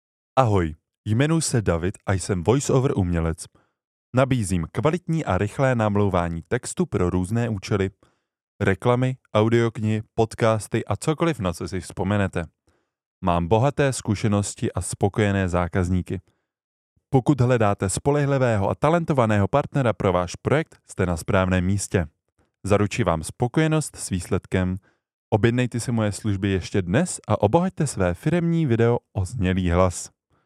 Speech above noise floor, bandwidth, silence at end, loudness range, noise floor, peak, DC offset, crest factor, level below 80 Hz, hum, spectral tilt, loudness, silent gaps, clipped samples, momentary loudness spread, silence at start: 46 dB; 13.5 kHz; 0.4 s; 3 LU; -68 dBFS; 0 dBFS; under 0.1%; 22 dB; -44 dBFS; none; -6 dB/octave; -23 LUFS; 0.98-1.04 s, 3.87-4.13 s, 8.43-8.59 s, 13.06-13.21 s, 16.64-16.96 s, 25.14-25.32 s; under 0.1%; 7 LU; 0.35 s